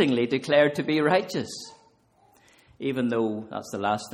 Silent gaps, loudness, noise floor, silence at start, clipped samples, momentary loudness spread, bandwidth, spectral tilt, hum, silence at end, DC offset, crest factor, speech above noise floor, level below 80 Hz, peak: none; -25 LUFS; -61 dBFS; 0 s; under 0.1%; 14 LU; 16 kHz; -5.5 dB/octave; none; 0 s; under 0.1%; 18 dB; 37 dB; -68 dBFS; -8 dBFS